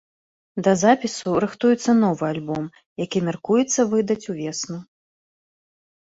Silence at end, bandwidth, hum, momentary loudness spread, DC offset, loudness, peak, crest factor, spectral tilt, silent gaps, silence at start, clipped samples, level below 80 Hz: 1.2 s; 8 kHz; none; 13 LU; under 0.1%; -21 LUFS; -4 dBFS; 20 dB; -5 dB/octave; 2.86-2.96 s; 0.55 s; under 0.1%; -62 dBFS